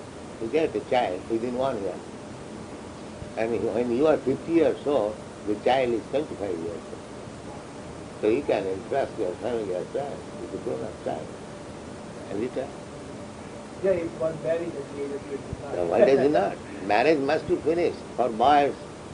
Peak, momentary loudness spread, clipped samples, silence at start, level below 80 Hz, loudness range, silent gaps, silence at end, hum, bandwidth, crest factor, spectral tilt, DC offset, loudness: -6 dBFS; 18 LU; under 0.1%; 0 s; -56 dBFS; 9 LU; none; 0 s; none; 10 kHz; 22 dB; -6 dB/octave; under 0.1%; -26 LUFS